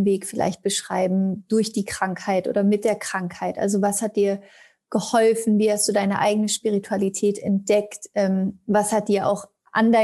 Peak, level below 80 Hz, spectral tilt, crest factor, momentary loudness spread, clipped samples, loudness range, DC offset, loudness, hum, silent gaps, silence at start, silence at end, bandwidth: -6 dBFS; -64 dBFS; -5 dB/octave; 16 dB; 7 LU; under 0.1%; 2 LU; under 0.1%; -22 LUFS; none; none; 0 s; 0 s; 13 kHz